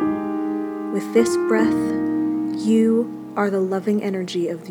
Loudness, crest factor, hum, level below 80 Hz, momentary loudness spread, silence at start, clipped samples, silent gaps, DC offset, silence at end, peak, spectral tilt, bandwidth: -21 LUFS; 18 dB; none; -60 dBFS; 7 LU; 0 s; under 0.1%; none; under 0.1%; 0 s; -4 dBFS; -6 dB/octave; 16.5 kHz